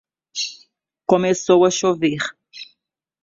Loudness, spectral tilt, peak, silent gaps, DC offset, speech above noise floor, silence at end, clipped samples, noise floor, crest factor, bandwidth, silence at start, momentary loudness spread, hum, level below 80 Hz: -19 LUFS; -4 dB/octave; -2 dBFS; none; under 0.1%; 56 dB; 0.6 s; under 0.1%; -72 dBFS; 18 dB; 7.8 kHz; 0.35 s; 23 LU; none; -64 dBFS